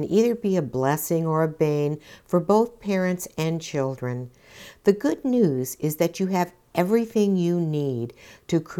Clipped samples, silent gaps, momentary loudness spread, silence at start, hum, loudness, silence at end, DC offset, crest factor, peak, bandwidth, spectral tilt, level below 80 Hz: under 0.1%; none; 7 LU; 0 s; none; -24 LUFS; 0 s; under 0.1%; 18 dB; -6 dBFS; 18.5 kHz; -6.5 dB/octave; -60 dBFS